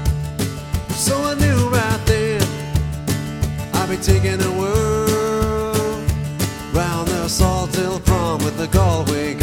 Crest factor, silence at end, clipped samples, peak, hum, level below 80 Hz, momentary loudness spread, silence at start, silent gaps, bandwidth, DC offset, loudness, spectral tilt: 18 dB; 0 s; under 0.1%; -2 dBFS; none; -28 dBFS; 6 LU; 0 s; none; 17.5 kHz; under 0.1%; -19 LUFS; -5 dB/octave